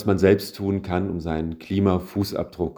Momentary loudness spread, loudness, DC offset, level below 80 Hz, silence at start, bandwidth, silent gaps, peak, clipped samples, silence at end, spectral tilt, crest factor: 9 LU; -24 LUFS; under 0.1%; -44 dBFS; 0 s; over 20 kHz; none; -4 dBFS; under 0.1%; 0.05 s; -7 dB/octave; 20 dB